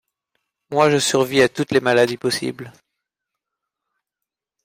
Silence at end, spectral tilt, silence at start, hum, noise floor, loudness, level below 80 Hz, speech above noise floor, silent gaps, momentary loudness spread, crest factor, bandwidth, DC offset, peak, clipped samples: 1.95 s; -4 dB/octave; 0.7 s; none; -85 dBFS; -18 LUFS; -60 dBFS; 67 dB; none; 9 LU; 18 dB; 16 kHz; under 0.1%; -2 dBFS; under 0.1%